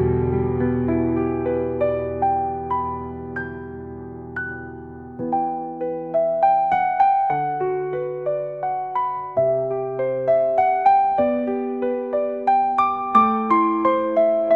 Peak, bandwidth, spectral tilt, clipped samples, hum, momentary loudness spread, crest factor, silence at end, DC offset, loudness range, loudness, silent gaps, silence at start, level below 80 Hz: -4 dBFS; 5 kHz; -9.5 dB/octave; under 0.1%; none; 13 LU; 18 dB; 0 s; under 0.1%; 8 LU; -21 LUFS; none; 0 s; -50 dBFS